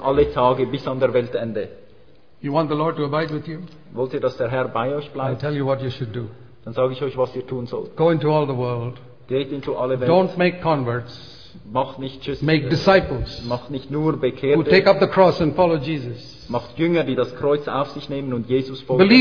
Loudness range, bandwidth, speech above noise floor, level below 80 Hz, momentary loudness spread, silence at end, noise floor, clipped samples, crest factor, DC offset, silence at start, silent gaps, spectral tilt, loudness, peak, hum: 6 LU; 5.4 kHz; 33 dB; -46 dBFS; 14 LU; 0 s; -53 dBFS; under 0.1%; 20 dB; 0.5%; 0 s; none; -8 dB/octave; -21 LUFS; 0 dBFS; none